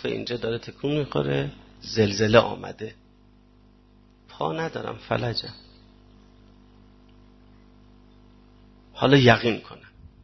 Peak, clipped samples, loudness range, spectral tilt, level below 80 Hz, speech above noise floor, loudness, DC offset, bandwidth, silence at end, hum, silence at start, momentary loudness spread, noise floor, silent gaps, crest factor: -2 dBFS; under 0.1%; 10 LU; -6 dB/octave; -52 dBFS; 32 dB; -24 LUFS; under 0.1%; 6.2 kHz; 0.15 s; 50 Hz at -55 dBFS; 0 s; 21 LU; -55 dBFS; none; 24 dB